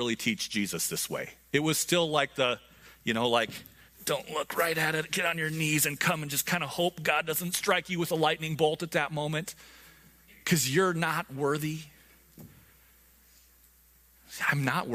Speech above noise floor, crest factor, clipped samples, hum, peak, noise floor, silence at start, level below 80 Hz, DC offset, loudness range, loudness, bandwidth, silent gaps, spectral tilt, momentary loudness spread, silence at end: 32 dB; 22 dB; under 0.1%; none; -8 dBFS; -61 dBFS; 0 s; -64 dBFS; under 0.1%; 5 LU; -29 LUFS; 15.5 kHz; none; -3.5 dB/octave; 9 LU; 0 s